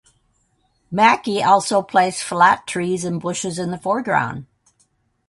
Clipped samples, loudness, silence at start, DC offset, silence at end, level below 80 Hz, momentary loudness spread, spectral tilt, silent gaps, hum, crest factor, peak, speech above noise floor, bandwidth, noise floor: under 0.1%; -18 LUFS; 0.9 s; under 0.1%; 0.85 s; -60 dBFS; 10 LU; -4 dB/octave; none; none; 20 dB; 0 dBFS; 46 dB; 11.5 kHz; -64 dBFS